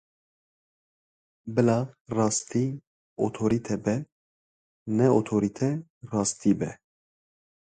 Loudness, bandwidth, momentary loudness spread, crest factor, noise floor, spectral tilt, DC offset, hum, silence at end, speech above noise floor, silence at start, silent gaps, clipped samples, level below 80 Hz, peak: -27 LUFS; 9.6 kHz; 12 LU; 20 dB; under -90 dBFS; -6 dB/octave; under 0.1%; none; 1 s; over 65 dB; 1.45 s; 2.01-2.05 s, 2.87-3.16 s, 4.12-4.86 s, 5.90-6.01 s; under 0.1%; -60 dBFS; -8 dBFS